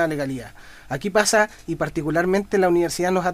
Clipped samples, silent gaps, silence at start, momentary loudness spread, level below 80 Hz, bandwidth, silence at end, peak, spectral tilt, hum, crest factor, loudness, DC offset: under 0.1%; none; 0 s; 12 LU; -48 dBFS; 15.5 kHz; 0 s; -2 dBFS; -4.5 dB/octave; none; 20 dB; -21 LUFS; under 0.1%